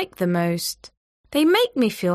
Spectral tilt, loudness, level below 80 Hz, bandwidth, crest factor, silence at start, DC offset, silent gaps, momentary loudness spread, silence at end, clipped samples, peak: -5 dB/octave; -21 LUFS; -60 dBFS; 15.5 kHz; 16 dB; 0 s; under 0.1%; 0.97-1.24 s; 10 LU; 0 s; under 0.1%; -6 dBFS